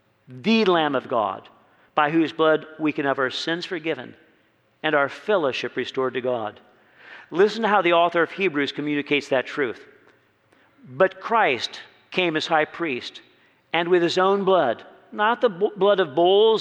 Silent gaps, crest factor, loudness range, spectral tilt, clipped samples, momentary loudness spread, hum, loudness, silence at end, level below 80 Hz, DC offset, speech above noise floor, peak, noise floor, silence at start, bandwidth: none; 18 dB; 3 LU; -5 dB/octave; under 0.1%; 10 LU; none; -22 LUFS; 0 s; -76 dBFS; under 0.1%; 41 dB; -4 dBFS; -62 dBFS; 0.3 s; 9 kHz